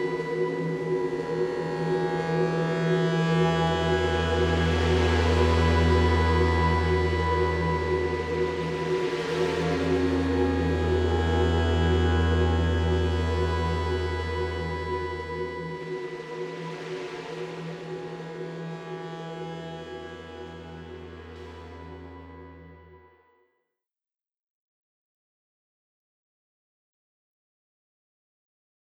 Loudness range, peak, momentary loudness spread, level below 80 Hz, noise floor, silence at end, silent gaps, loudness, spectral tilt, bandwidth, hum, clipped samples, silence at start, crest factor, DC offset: 17 LU; -10 dBFS; 18 LU; -36 dBFS; under -90 dBFS; 6 s; none; -26 LUFS; -7 dB/octave; 10.5 kHz; none; under 0.1%; 0 s; 18 dB; under 0.1%